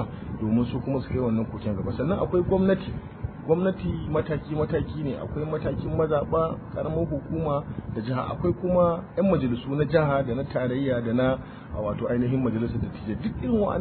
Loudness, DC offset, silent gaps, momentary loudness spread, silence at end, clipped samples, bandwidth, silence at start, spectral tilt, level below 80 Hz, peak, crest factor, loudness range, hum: -26 LUFS; under 0.1%; none; 8 LU; 0 s; under 0.1%; 4.5 kHz; 0 s; -12.5 dB/octave; -44 dBFS; -8 dBFS; 16 dB; 3 LU; none